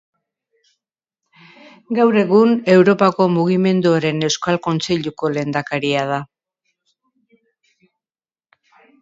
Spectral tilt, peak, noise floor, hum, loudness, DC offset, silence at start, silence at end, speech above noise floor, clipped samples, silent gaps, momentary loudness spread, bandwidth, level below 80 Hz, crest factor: -6 dB/octave; 0 dBFS; under -90 dBFS; none; -16 LUFS; under 0.1%; 1.9 s; 2.75 s; over 74 dB; under 0.1%; none; 9 LU; 7.8 kHz; -60 dBFS; 18 dB